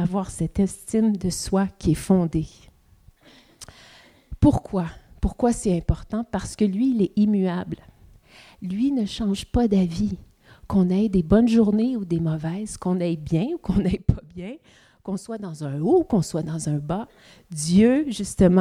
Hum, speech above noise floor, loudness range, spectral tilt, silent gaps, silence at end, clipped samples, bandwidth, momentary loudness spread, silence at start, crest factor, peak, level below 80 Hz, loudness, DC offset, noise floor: none; 33 dB; 5 LU; -7 dB/octave; none; 0 s; under 0.1%; 13 kHz; 14 LU; 0 s; 20 dB; -4 dBFS; -38 dBFS; -23 LUFS; under 0.1%; -55 dBFS